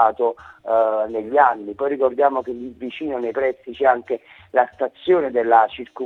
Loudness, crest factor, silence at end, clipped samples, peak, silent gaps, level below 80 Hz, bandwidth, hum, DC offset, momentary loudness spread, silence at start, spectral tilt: -20 LUFS; 18 dB; 0 s; under 0.1%; -2 dBFS; none; -62 dBFS; 4.3 kHz; none; under 0.1%; 12 LU; 0 s; -6.5 dB/octave